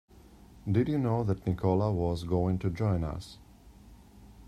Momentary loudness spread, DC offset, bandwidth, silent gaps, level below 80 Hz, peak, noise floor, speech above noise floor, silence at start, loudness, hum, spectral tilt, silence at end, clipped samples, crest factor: 10 LU; under 0.1%; 11.5 kHz; none; -50 dBFS; -14 dBFS; -54 dBFS; 25 dB; 0.55 s; -30 LUFS; none; -9 dB/octave; 0 s; under 0.1%; 16 dB